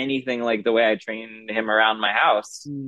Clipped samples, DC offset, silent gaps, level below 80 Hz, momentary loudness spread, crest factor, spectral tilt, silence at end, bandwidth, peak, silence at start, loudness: under 0.1%; under 0.1%; none; -74 dBFS; 12 LU; 18 dB; -4 dB/octave; 0 s; 12 kHz; -4 dBFS; 0 s; -21 LUFS